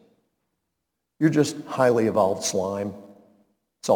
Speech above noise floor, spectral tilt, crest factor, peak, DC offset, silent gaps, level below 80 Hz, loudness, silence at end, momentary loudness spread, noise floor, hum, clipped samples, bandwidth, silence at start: 59 dB; -5 dB/octave; 18 dB; -6 dBFS; under 0.1%; none; -70 dBFS; -23 LUFS; 0 s; 13 LU; -81 dBFS; none; under 0.1%; 19 kHz; 1.2 s